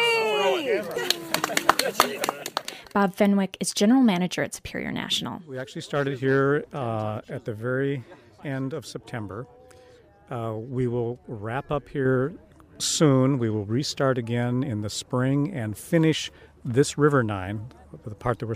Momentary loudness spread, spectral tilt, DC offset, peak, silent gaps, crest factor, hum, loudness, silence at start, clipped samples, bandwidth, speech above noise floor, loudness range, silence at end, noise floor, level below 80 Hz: 14 LU; -5 dB/octave; under 0.1%; -2 dBFS; none; 22 dB; none; -25 LUFS; 0 s; under 0.1%; 15.5 kHz; 28 dB; 9 LU; 0 s; -53 dBFS; -56 dBFS